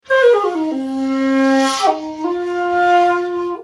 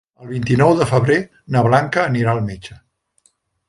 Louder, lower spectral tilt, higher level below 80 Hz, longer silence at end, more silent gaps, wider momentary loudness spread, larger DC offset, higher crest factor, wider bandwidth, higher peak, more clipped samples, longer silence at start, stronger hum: about the same, -16 LUFS vs -17 LUFS; second, -3 dB/octave vs -7 dB/octave; second, -60 dBFS vs -48 dBFS; second, 0 s vs 0.95 s; neither; second, 9 LU vs 14 LU; neither; about the same, 14 dB vs 18 dB; first, 13 kHz vs 11.5 kHz; about the same, -2 dBFS vs 0 dBFS; neither; about the same, 0.1 s vs 0.2 s; neither